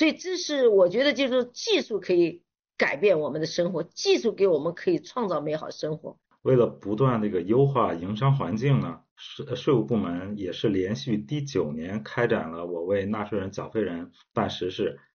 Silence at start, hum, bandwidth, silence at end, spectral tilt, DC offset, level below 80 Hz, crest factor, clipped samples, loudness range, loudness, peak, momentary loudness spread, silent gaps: 0 s; none; 6.8 kHz; 0.15 s; -5 dB/octave; under 0.1%; -64 dBFS; 16 dB; under 0.1%; 5 LU; -26 LUFS; -10 dBFS; 10 LU; 9.11-9.16 s